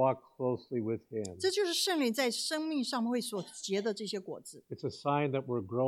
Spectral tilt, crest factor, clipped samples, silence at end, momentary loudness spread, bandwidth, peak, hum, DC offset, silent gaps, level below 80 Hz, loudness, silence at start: -4 dB/octave; 16 dB; under 0.1%; 0 s; 10 LU; 16.5 kHz; -16 dBFS; none; under 0.1%; none; -78 dBFS; -34 LUFS; 0 s